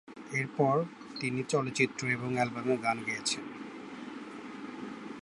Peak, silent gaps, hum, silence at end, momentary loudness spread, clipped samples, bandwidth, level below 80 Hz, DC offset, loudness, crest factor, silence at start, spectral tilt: -12 dBFS; none; none; 0 s; 15 LU; under 0.1%; 11.5 kHz; -74 dBFS; under 0.1%; -32 LUFS; 22 dB; 0.05 s; -4.5 dB/octave